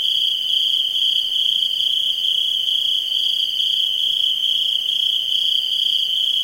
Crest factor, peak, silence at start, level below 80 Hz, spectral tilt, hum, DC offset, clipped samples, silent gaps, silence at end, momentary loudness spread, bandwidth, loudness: 14 dB; -6 dBFS; 0 s; -66 dBFS; 2 dB/octave; none; under 0.1%; under 0.1%; none; 0 s; 1 LU; 16.5 kHz; -16 LUFS